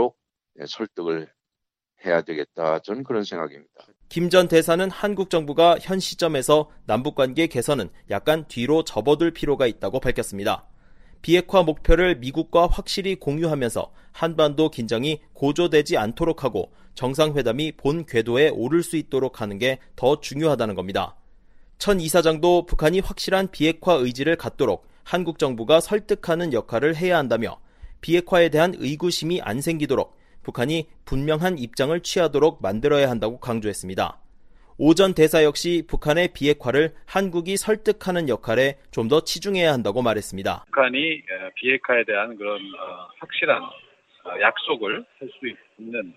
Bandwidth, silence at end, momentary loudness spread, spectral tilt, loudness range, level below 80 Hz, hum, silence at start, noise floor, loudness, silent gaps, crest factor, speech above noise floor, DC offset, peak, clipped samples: 15.5 kHz; 0.05 s; 11 LU; -5 dB/octave; 4 LU; -38 dBFS; none; 0 s; -84 dBFS; -22 LUFS; none; 20 dB; 63 dB; under 0.1%; -2 dBFS; under 0.1%